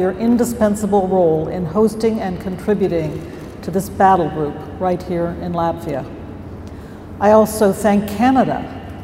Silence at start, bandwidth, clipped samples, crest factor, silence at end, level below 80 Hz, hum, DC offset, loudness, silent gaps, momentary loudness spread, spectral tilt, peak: 0 s; 16 kHz; under 0.1%; 18 dB; 0 s; -42 dBFS; none; under 0.1%; -17 LUFS; none; 18 LU; -6.5 dB/octave; 0 dBFS